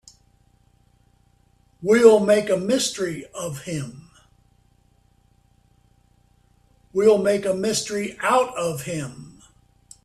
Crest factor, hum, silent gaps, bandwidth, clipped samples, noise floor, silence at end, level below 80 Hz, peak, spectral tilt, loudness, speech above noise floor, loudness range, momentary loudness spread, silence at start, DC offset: 22 dB; 60 Hz at -60 dBFS; none; 13.5 kHz; under 0.1%; -60 dBFS; 0.75 s; -60 dBFS; -2 dBFS; -4.5 dB/octave; -21 LUFS; 40 dB; 15 LU; 17 LU; 1.8 s; under 0.1%